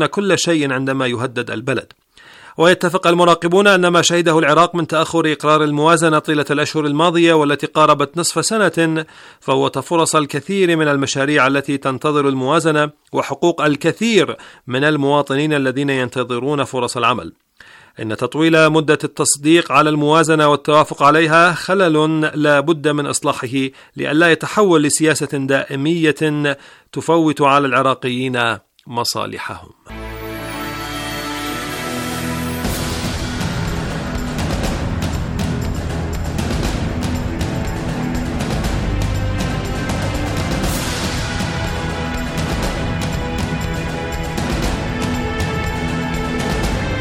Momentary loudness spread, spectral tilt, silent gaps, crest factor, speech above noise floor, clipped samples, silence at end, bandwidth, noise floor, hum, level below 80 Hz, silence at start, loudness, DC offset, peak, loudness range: 11 LU; -4.5 dB/octave; none; 16 dB; 29 dB; under 0.1%; 0 s; 17 kHz; -45 dBFS; none; -32 dBFS; 0 s; -16 LUFS; under 0.1%; 0 dBFS; 9 LU